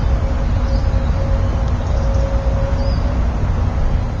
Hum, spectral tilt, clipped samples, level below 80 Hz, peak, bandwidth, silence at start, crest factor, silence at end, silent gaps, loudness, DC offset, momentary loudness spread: none; -8 dB/octave; under 0.1%; -18 dBFS; -4 dBFS; 7.2 kHz; 0 s; 12 dB; 0 s; none; -19 LUFS; under 0.1%; 1 LU